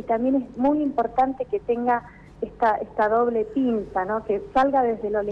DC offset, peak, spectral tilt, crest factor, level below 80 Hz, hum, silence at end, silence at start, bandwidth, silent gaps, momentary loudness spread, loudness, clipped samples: under 0.1%; -12 dBFS; -8 dB/octave; 12 dB; -50 dBFS; none; 0 s; 0 s; 7 kHz; none; 5 LU; -23 LUFS; under 0.1%